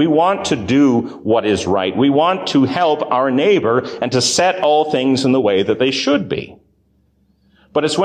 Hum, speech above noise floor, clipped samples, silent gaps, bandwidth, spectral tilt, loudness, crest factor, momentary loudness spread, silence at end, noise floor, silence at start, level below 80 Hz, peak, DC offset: none; 43 dB; under 0.1%; none; 10 kHz; -4.5 dB/octave; -15 LUFS; 12 dB; 5 LU; 0 s; -58 dBFS; 0 s; -48 dBFS; -4 dBFS; under 0.1%